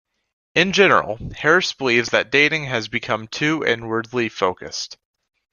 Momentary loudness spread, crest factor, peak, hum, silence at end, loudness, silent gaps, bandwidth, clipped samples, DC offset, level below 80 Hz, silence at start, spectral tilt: 12 LU; 20 dB; 0 dBFS; none; 0.6 s; -19 LUFS; none; 10 kHz; under 0.1%; under 0.1%; -52 dBFS; 0.55 s; -4 dB/octave